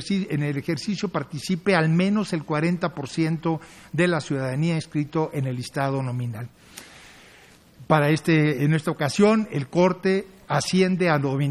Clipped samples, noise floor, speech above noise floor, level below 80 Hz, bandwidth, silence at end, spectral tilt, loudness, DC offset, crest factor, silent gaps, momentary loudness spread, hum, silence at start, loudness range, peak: under 0.1%; -51 dBFS; 29 dB; -60 dBFS; 14 kHz; 0 s; -6.5 dB/octave; -23 LUFS; under 0.1%; 20 dB; none; 9 LU; none; 0 s; 6 LU; -4 dBFS